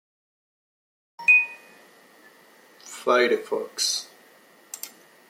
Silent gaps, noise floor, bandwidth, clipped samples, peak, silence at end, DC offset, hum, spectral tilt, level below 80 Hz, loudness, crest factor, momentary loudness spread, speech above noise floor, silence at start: none; -55 dBFS; 16.5 kHz; under 0.1%; -8 dBFS; 0.4 s; under 0.1%; none; -0.5 dB/octave; -88 dBFS; -21 LUFS; 20 dB; 24 LU; 31 dB; 1.2 s